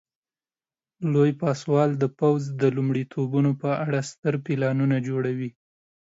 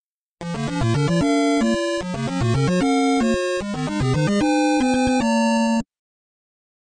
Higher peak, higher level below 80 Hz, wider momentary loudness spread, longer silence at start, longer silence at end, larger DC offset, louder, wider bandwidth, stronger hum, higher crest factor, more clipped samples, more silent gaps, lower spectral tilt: about the same, -10 dBFS vs -8 dBFS; second, -70 dBFS vs -42 dBFS; about the same, 6 LU vs 7 LU; first, 1 s vs 0.4 s; second, 0.6 s vs 1.15 s; neither; second, -24 LUFS vs -20 LUFS; second, 8 kHz vs 10 kHz; neither; about the same, 16 dB vs 12 dB; neither; first, 4.18-4.23 s vs none; first, -8 dB/octave vs -6 dB/octave